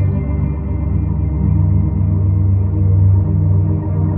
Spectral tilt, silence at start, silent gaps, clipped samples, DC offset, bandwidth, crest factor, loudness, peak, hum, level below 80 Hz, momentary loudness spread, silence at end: -15 dB/octave; 0 s; none; under 0.1%; under 0.1%; 2.5 kHz; 10 dB; -16 LUFS; -4 dBFS; none; -22 dBFS; 6 LU; 0 s